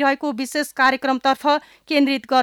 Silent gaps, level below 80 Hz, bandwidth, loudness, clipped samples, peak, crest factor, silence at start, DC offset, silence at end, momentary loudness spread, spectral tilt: none; -66 dBFS; 17.5 kHz; -20 LUFS; under 0.1%; -6 dBFS; 14 dB; 0 s; under 0.1%; 0 s; 6 LU; -2.5 dB/octave